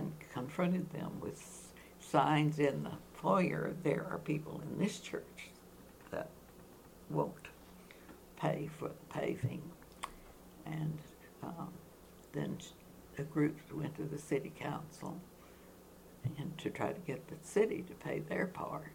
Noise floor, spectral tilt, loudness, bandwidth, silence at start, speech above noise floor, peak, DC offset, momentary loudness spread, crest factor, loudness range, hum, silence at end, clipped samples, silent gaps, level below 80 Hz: -58 dBFS; -6.5 dB/octave; -39 LUFS; 18 kHz; 0 s; 20 dB; -14 dBFS; under 0.1%; 23 LU; 26 dB; 10 LU; none; 0 s; under 0.1%; none; -66 dBFS